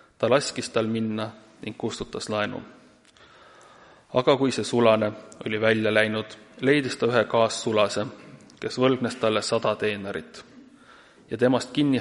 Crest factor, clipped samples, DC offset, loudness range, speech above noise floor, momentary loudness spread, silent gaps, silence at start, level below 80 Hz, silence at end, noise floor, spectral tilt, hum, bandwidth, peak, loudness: 22 dB; under 0.1%; under 0.1%; 7 LU; 30 dB; 15 LU; none; 0.2 s; -62 dBFS; 0 s; -54 dBFS; -5 dB/octave; none; 11.5 kHz; -4 dBFS; -24 LUFS